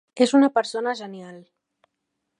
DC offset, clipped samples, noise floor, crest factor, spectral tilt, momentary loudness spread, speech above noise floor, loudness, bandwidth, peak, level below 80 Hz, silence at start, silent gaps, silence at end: under 0.1%; under 0.1%; -79 dBFS; 20 dB; -4 dB/octave; 22 LU; 58 dB; -21 LUFS; 10.5 kHz; -4 dBFS; -82 dBFS; 0.15 s; none; 1 s